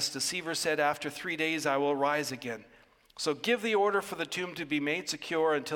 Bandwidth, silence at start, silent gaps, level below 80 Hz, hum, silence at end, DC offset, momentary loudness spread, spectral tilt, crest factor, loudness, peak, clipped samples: 17 kHz; 0 s; none; -72 dBFS; none; 0 s; under 0.1%; 7 LU; -3 dB/octave; 18 dB; -31 LUFS; -14 dBFS; under 0.1%